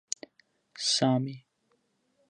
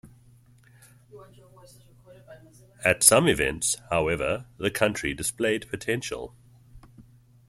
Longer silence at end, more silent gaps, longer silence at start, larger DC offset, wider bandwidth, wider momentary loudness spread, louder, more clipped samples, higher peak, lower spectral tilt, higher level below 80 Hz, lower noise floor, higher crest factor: first, 0.9 s vs 0.45 s; neither; first, 0.75 s vs 0.05 s; neither; second, 11.5 kHz vs 16 kHz; about the same, 14 LU vs 13 LU; second, -29 LUFS vs -24 LUFS; neither; second, -12 dBFS vs 0 dBFS; about the same, -4 dB/octave vs -3 dB/octave; second, -80 dBFS vs -52 dBFS; first, -74 dBFS vs -56 dBFS; second, 22 dB vs 28 dB